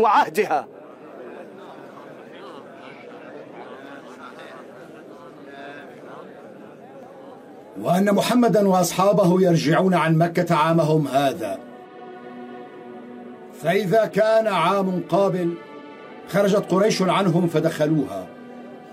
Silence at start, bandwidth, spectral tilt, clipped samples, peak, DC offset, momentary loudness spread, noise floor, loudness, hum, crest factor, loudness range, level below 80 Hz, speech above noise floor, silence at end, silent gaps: 0 s; 16 kHz; -6 dB/octave; under 0.1%; -6 dBFS; under 0.1%; 23 LU; -42 dBFS; -20 LUFS; none; 16 dB; 21 LU; -68 dBFS; 23 dB; 0 s; none